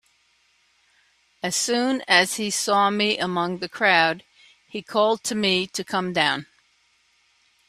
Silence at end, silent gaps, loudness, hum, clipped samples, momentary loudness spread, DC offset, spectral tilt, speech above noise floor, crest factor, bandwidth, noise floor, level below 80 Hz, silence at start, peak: 1.25 s; none; -21 LUFS; none; under 0.1%; 10 LU; under 0.1%; -2.5 dB/octave; 42 dB; 24 dB; 15 kHz; -64 dBFS; -68 dBFS; 1.45 s; -2 dBFS